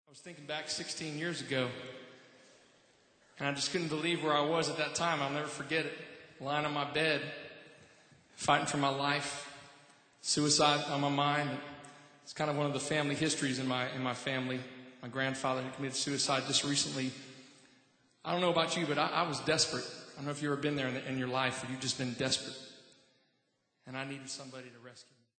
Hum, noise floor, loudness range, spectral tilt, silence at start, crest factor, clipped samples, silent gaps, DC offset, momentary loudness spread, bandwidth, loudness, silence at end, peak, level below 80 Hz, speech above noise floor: none; -78 dBFS; 5 LU; -3.5 dB/octave; 0.1 s; 24 dB; under 0.1%; none; under 0.1%; 18 LU; 9.2 kHz; -33 LUFS; 0.35 s; -12 dBFS; -74 dBFS; 44 dB